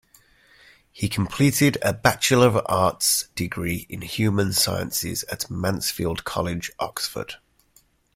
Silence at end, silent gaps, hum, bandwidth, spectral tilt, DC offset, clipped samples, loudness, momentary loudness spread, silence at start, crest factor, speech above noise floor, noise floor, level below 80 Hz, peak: 0.8 s; none; none; 16.5 kHz; -4 dB/octave; under 0.1%; under 0.1%; -23 LUFS; 11 LU; 0.95 s; 22 dB; 38 dB; -60 dBFS; -50 dBFS; -2 dBFS